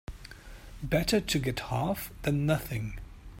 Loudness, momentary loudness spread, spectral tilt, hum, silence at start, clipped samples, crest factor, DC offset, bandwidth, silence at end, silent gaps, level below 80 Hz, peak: -30 LUFS; 21 LU; -5.5 dB/octave; none; 0.1 s; under 0.1%; 20 dB; under 0.1%; 16.5 kHz; 0 s; none; -46 dBFS; -12 dBFS